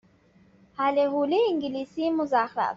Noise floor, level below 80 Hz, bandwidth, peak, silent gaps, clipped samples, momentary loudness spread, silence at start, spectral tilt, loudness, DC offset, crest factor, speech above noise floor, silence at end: -59 dBFS; -68 dBFS; 7.4 kHz; -10 dBFS; none; under 0.1%; 6 LU; 0.8 s; -2.5 dB/octave; -25 LUFS; under 0.1%; 16 dB; 34 dB; 0 s